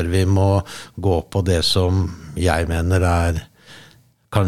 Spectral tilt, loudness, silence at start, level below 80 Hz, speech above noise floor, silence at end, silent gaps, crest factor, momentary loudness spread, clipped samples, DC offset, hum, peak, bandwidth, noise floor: -6 dB/octave; -19 LUFS; 0 s; -38 dBFS; 33 dB; 0 s; none; 18 dB; 8 LU; under 0.1%; under 0.1%; none; -2 dBFS; 13.5 kHz; -51 dBFS